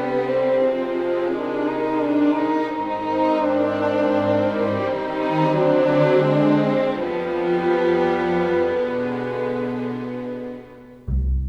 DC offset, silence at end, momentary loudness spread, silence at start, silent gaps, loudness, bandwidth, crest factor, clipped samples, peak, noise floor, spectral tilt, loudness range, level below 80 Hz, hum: under 0.1%; 0 s; 9 LU; 0 s; none; -21 LUFS; 7.6 kHz; 14 dB; under 0.1%; -6 dBFS; -41 dBFS; -8.5 dB/octave; 3 LU; -36 dBFS; none